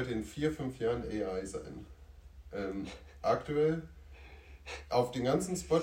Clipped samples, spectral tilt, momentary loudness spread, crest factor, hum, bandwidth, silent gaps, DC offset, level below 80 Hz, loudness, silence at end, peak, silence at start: under 0.1%; -6 dB/octave; 22 LU; 20 dB; none; 16 kHz; none; under 0.1%; -54 dBFS; -35 LUFS; 0 s; -14 dBFS; 0 s